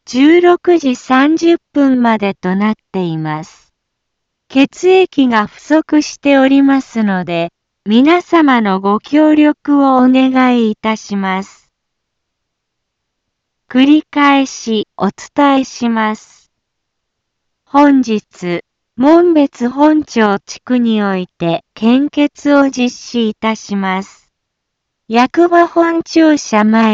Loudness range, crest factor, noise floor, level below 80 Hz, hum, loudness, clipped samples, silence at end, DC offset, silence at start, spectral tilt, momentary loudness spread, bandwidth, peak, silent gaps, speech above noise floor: 5 LU; 12 dB; -74 dBFS; -56 dBFS; none; -12 LUFS; under 0.1%; 0 s; under 0.1%; 0.1 s; -5.5 dB/octave; 9 LU; 7.8 kHz; 0 dBFS; none; 62 dB